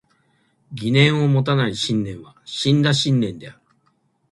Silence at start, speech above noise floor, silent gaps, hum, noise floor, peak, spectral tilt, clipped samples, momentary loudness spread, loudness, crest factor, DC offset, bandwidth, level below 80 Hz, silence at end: 0.7 s; 46 dB; none; none; -65 dBFS; -2 dBFS; -5.5 dB/octave; under 0.1%; 16 LU; -19 LUFS; 18 dB; under 0.1%; 11.5 kHz; -56 dBFS; 0.8 s